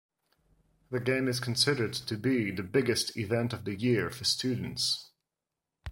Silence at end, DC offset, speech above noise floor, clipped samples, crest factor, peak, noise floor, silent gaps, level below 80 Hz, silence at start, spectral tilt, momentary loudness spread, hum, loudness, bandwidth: 0 s; under 0.1%; 58 dB; under 0.1%; 18 dB; -12 dBFS; -88 dBFS; none; -62 dBFS; 0.9 s; -4 dB/octave; 7 LU; none; -30 LUFS; 16.5 kHz